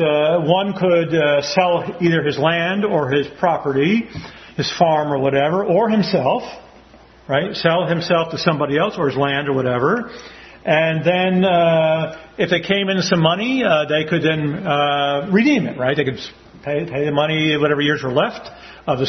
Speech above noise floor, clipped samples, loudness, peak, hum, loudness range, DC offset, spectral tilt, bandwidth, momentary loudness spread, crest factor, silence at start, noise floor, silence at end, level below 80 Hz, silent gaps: 28 dB; under 0.1%; -18 LUFS; 0 dBFS; none; 2 LU; under 0.1%; -6 dB/octave; 6.4 kHz; 8 LU; 18 dB; 0 s; -46 dBFS; 0 s; -54 dBFS; none